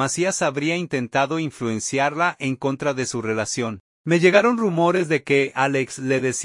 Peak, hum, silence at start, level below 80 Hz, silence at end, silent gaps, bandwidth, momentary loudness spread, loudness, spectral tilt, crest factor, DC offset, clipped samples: -2 dBFS; none; 0 s; -64 dBFS; 0 s; 3.80-4.05 s; 11.5 kHz; 8 LU; -21 LUFS; -4.5 dB/octave; 20 dB; under 0.1%; under 0.1%